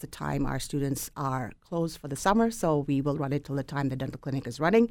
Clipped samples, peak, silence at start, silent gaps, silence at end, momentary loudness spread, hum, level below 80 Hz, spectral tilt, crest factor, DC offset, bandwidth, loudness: under 0.1%; -10 dBFS; 0 s; none; 0 s; 9 LU; none; -46 dBFS; -6 dB/octave; 20 dB; under 0.1%; 18.5 kHz; -29 LUFS